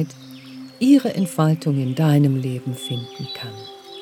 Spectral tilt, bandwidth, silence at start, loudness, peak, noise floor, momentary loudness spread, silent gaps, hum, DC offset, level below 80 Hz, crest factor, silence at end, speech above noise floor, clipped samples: -7 dB/octave; 15 kHz; 0 s; -20 LUFS; -4 dBFS; -38 dBFS; 21 LU; none; none; under 0.1%; -66 dBFS; 16 dB; 0 s; 19 dB; under 0.1%